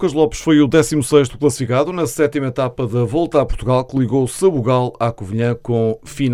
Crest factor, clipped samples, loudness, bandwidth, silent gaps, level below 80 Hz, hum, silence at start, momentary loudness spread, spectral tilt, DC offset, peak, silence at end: 16 dB; under 0.1%; -17 LUFS; 15.5 kHz; none; -36 dBFS; none; 0 s; 7 LU; -6.5 dB/octave; under 0.1%; 0 dBFS; 0 s